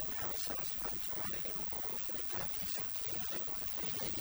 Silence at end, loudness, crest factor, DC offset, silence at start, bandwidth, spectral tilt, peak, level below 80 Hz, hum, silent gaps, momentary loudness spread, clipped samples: 0 s; -36 LUFS; 18 dB; under 0.1%; 0 s; over 20 kHz; -2.5 dB/octave; -22 dBFS; -58 dBFS; none; none; 1 LU; under 0.1%